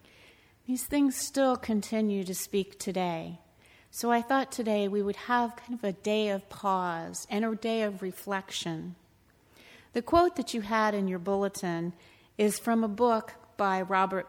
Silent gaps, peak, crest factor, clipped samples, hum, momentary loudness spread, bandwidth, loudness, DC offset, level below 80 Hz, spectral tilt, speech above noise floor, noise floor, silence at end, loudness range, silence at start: none; -10 dBFS; 20 dB; under 0.1%; none; 10 LU; over 20 kHz; -30 LUFS; under 0.1%; -60 dBFS; -4.5 dB/octave; 34 dB; -63 dBFS; 0 s; 2 LU; 0.7 s